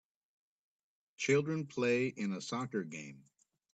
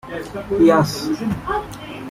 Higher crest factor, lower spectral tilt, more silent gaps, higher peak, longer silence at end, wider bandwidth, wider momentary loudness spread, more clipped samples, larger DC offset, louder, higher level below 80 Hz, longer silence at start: about the same, 20 dB vs 16 dB; about the same, -5.5 dB/octave vs -6 dB/octave; neither; second, -18 dBFS vs -2 dBFS; first, 0.55 s vs 0 s; second, 9 kHz vs 15.5 kHz; second, 13 LU vs 16 LU; neither; neither; second, -35 LUFS vs -19 LUFS; second, -80 dBFS vs -42 dBFS; first, 1.2 s vs 0.05 s